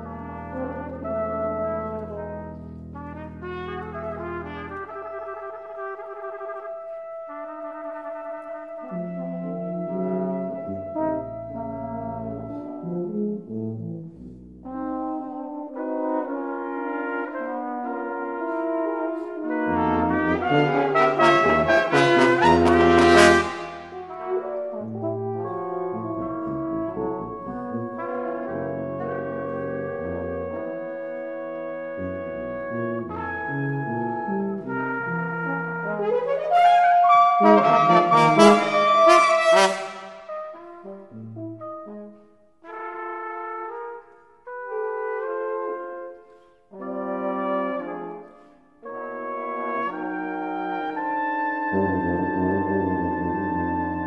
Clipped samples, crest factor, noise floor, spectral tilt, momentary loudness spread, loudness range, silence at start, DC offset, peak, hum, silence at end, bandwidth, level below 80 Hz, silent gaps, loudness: under 0.1%; 22 dB; -54 dBFS; -5.5 dB/octave; 19 LU; 17 LU; 0 s; under 0.1%; -2 dBFS; none; 0 s; 11.5 kHz; -52 dBFS; none; -23 LUFS